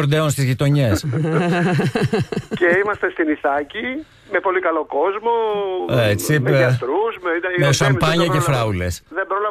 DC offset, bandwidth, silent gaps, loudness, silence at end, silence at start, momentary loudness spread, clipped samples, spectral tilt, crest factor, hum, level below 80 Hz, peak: under 0.1%; 14 kHz; none; -18 LUFS; 0 s; 0 s; 7 LU; under 0.1%; -5.5 dB/octave; 14 dB; none; -46 dBFS; -4 dBFS